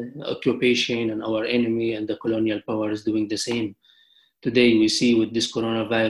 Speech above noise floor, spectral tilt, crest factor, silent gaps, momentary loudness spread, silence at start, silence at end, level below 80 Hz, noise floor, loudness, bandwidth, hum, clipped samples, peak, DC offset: 37 dB; -4.5 dB/octave; 16 dB; none; 8 LU; 0 s; 0 s; -60 dBFS; -59 dBFS; -23 LUFS; 12 kHz; none; under 0.1%; -6 dBFS; under 0.1%